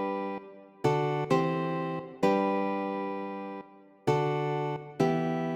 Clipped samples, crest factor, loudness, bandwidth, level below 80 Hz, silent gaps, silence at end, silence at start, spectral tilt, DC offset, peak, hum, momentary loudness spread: under 0.1%; 18 dB; -30 LUFS; 14 kHz; -66 dBFS; none; 0 s; 0 s; -7.5 dB/octave; under 0.1%; -10 dBFS; none; 10 LU